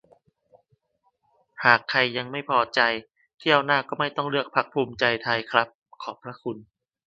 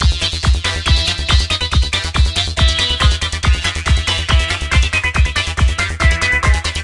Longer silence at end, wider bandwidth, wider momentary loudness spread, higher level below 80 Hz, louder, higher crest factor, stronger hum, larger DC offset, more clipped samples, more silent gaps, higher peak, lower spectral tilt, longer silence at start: first, 0.45 s vs 0 s; second, 7.8 kHz vs 11.5 kHz; first, 16 LU vs 3 LU; second, -68 dBFS vs -18 dBFS; second, -23 LUFS vs -15 LUFS; first, 26 dB vs 14 dB; neither; neither; neither; first, 3.34-3.38 s, 5.75-5.82 s vs none; about the same, 0 dBFS vs 0 dBFS; first, -5 dB/octave vs -3.5 dB/octave; first, 1.6 s vs 0 s